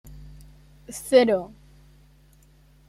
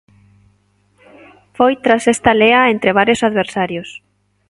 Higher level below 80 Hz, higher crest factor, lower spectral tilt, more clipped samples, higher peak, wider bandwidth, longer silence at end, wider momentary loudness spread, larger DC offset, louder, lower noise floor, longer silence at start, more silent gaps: about the same, -52 dBFS vs -48 dBFS; first, 22 dB vs 16 dB; about the same, -4.5 dB/octave vs -4.5 dB/octave; neither; second, -4 dBFS vs 0 dBFS; first, 15.5 kHz vs 11.5 kHz; first, 1.45 s vs 0.55 s; first, 25 LU vs 11 LU; neither; second, -21 LUFS vs -13 LUFS; about the same, -55 dBFS vs -58 dBFS; second, 0.9 s vs 1.6 s; neither